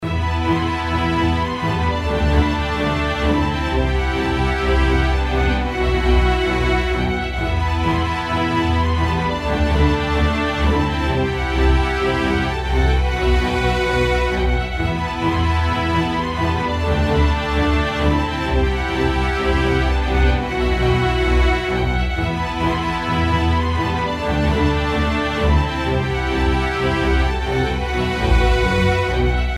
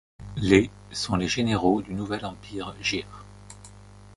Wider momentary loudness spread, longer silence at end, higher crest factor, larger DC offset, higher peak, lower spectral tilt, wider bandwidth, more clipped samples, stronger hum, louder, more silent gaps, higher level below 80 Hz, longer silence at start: second, 3 LU vs 25 LU; about the same, 0 s vs 0 s; second, 14 dB vs 24 dB; neither; about the same, -4 dBFS vs -4 dBFS; first, -6.5 dB/octave vs -5 dB/octave; about the same, 11.5 kHz vs 11.5 kHz; neither; second, none vs 50 Hz at -45 dBFS; first, -19 LUFS vs -26 LUFS; neither; first, -22 dBFS vs -46 dBFS; second, 0 s vs 0.2 s